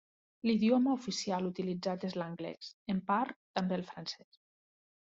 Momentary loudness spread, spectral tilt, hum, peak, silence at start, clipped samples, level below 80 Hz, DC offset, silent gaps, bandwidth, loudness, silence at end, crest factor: 14 LU; -5 dB/octave; none; -18 dBFS; 0.45 s; under 0.1%; -74 dBFS; under 0.1%; 2.74-2.86 s, 3.36-3.54 s; 7.8 kHz; -35 LUFS; 1 s; 18 dB